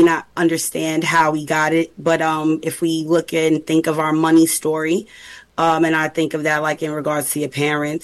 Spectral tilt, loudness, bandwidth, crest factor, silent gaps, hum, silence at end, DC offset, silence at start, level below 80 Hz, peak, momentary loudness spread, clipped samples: -4.5 dB/octave; -18 LUFS; 12.5 kHz; 14 dB; none; none; 0.05 s; under 0.1%; 0 s; -58 dBFS; -4 dBFS; 6 LU; under 0.1%